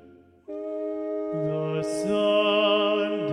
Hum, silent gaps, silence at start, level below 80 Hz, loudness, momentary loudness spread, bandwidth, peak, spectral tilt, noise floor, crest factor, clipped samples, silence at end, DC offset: none; none; 0.05 s; -68 dBFS; -25 LUFS; 12 LU; 12 kHz; -10 dBFS; -5 dB/octave; -48 dBFS; 14 dB; under 0.1%; 0 s; under 0.1%